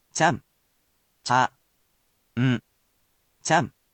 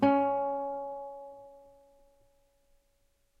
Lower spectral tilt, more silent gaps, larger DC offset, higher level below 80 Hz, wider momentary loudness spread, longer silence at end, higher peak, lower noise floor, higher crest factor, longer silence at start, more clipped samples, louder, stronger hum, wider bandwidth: second, -4.5 dB/octave vs -8 dB/octave; neither; neither; first, -64 dBFS vs -70 dBFS; second, 13 LU vs 24 LU; second, 0.25 s vs 1.8 s; first, -8 dBFS vs -14 dBFS; about the same, -69 dBFS vs -71 dBFS; about the same, 20 dB vs 20 dB; first, 0.15 s vs 0 s; neither; first, -25 LUFS vs -32 LUFS; neither; first, 9 kHz vs 5.4 kHz